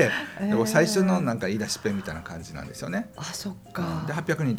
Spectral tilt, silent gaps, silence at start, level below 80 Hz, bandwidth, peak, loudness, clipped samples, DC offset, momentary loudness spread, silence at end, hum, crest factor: -5 dB/octave; none; 0 s; -56 dBFS; 16.5 kHz; -6 dBFS; -27 LUFS; under 0.1%; under 0.1%; 14 LU; 0 s; none; 20 dB